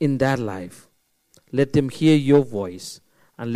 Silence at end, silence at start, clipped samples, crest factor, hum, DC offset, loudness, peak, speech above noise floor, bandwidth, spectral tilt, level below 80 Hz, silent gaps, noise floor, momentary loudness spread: 0 s; 0 s; under 0.1%; 20 dB; none; under 0.1%; -20 LUFS; -2 dBFS; 42 dB; 14.5 kHz; -7 dB/octave; -54 dBFS; none; -62 dBFS; 19 LU